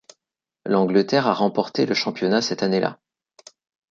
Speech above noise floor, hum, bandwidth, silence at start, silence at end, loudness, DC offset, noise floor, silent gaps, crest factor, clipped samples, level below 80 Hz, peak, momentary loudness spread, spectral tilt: 65 dB; none; 7.6 kHz; 0.65 s; 0.95 s; -21 LUFS; under 0.1%; -85 dBFS; none; 20 dB; under 0.1%; -68 dBFS; -4 dBFS; 5 LU; -5 dB/octave